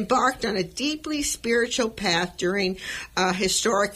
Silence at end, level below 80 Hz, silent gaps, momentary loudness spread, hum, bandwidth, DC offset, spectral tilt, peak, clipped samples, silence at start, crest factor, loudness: 0 s; -50 dBFS; none; 6 LU; none; 16 kHz; under 0.1%; -3 dB/octave; -8 dBFS; under 0.1%; 0 s; 16 dB; -24 LUFS